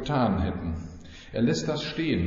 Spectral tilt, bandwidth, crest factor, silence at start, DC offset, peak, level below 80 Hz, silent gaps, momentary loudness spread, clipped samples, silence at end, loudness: -5.5 dB/octave; 7.6 kHz; 14 dB; 0 s; under 0.1%; -14 dBFS; -44 dBFS; none; 13 LU; under 0.1%; 0 s; -28 LUFS